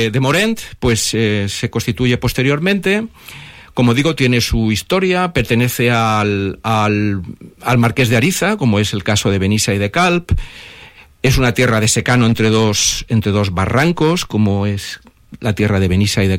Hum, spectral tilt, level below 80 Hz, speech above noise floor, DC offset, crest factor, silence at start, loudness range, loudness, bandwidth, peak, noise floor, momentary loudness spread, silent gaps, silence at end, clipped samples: none; -5 dB/octave; -32 dBFS; 26 dB; under 0.1%; 12 dB; 0 s; 2 LU; -15 LUFS; 16.5 kHz; -2 dBFS; -41 dBFS; 9 LU; none; 0 s; under 0.1%